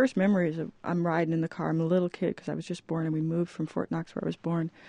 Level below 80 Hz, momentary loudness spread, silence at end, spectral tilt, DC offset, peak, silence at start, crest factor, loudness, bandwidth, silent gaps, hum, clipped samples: -68 dBFS; 8 LU; 0 s; -8 dB/octave; under 0.1%; -12 dBFS; 0 s; 16 dB; -30 LUFS; 9.8 kHz; none; none; under 0.1%